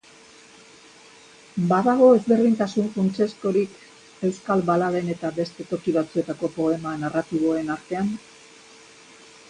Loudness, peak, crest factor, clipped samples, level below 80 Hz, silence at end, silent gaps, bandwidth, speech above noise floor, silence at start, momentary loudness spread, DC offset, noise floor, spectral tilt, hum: -23 LUFS; -4 dBFS; 18 dB; under 0.1%; -64 dBFS; 1.3 s; none; 10.5 kHz; 28 dB; 1.55 s; 12 LU; under 0.1%; -50 dBFS; -7 dB/octave; none